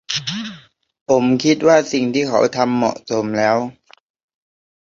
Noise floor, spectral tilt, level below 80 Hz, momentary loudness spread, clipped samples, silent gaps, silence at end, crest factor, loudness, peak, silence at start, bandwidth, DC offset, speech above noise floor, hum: -43 dBFS; -4.5 dB/octave; -60 dBFS; 13 LU; under 0.1%; 1.01-1.06 s; 1.15 s; 16 dB; -17 LUFS; -2 dBFS; 0.1 s; 7.6 kHz; under 0.1%; 27 dB; none